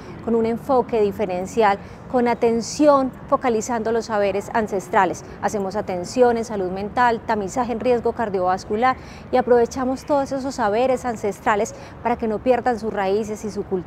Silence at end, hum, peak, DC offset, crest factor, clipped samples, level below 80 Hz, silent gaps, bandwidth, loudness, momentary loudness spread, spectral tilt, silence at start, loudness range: 0 s; none; -2 dBFS; under 0.1%; 18 dB; under 0.1%; -48 dBFS; none; 15 kHz; -21 LUFS; 7 LU; -5 dB/octave; 0 s; 2 LU